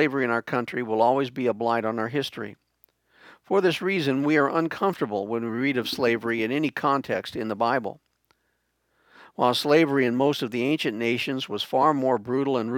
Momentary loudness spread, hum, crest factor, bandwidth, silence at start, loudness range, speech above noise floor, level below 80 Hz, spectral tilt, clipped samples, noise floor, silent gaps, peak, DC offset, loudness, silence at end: 7 LU; none; 18 dB; 19 kHz; 0 s; 4 LU; 49 dB; -72 dBFS; -5.5 dB/octave; under 0.1%; -73 dBFS; none; -6 dBFS; under 0.1%; -24 LUFS; 0 s